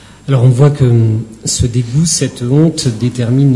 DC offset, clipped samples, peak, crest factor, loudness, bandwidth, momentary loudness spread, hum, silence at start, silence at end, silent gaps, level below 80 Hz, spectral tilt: under 0.1%; 0.2%; 0 dBFS; 10 dB; -12 LUFS; 11.5 kHz; 7 LU; none; 0.25 s; 0 s; none; -36 dBFS; -6 dB/octave